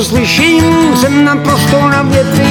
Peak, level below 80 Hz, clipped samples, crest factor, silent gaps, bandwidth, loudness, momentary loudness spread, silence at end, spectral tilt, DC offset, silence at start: 0 dBFS; -32 dBFS; under 0.1%; 8 dB; none; 19.5 kHz; -8 LUFS; 2 LU; 0 s; -5 dB/octave; 0.2%; 0 s